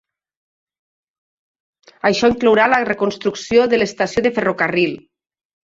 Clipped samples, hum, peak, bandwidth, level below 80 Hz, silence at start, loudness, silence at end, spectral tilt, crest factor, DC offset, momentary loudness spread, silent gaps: under 0.1%; none; -2 dBFS; 7.8 kHz; -52 dBFS; 2.05 s; -16 LUFS; 0.7 s; -4.5 dB/octave; 18 dB; under 0.1%; 7 LU; none